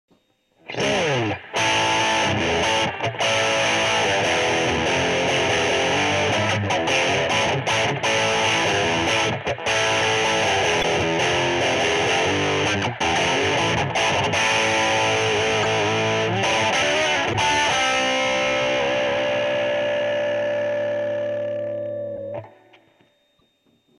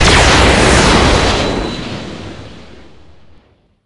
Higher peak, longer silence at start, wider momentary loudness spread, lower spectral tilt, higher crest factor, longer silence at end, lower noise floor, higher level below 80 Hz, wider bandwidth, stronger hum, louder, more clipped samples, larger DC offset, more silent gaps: second, -8 dBFS vs 0 dBFS; first, 0.7 s vs 0 s; second, 5 LU vs 21 LU; about the same, -3 dB/octave vs -4 dB/octave; about the same, 12 dB vs 12 dB; first, 1.5 s vs 1.25 s; first, -64 dBFS vs -49 dBFS; second, -50 dBFS vs -20 dBFS; first, 14 kHz vs 11.5 kHz; neither; second, -20 LUFS vs -10 LUFS; second, under 0.1% vs 0.2%; neither; neither